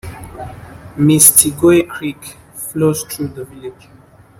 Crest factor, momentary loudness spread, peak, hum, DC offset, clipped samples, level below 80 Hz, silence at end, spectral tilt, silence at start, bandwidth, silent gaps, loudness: 16 dB; 26 LU; 0 dBFS; none; under 0.1%; 0.3%; -46 dBFS; 0.7 s; -4 dB/octave; 0.05 s; 16.5 kHz; none; -11 LUFS